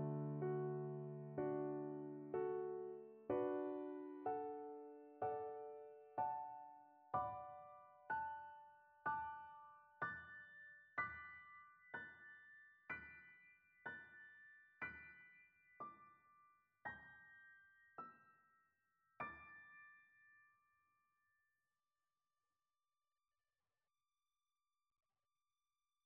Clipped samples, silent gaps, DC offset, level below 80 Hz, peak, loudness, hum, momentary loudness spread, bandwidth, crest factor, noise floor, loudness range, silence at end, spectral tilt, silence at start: under 0.1%; none; under 0.1%; -84 dBFS; -30 dBFS; -49 LUFS; none; 19 LU; 4.6 kHz; 22 dB; under -90 dBFS; 13 LU; 5.6 s; -7 dB/octave; 0 s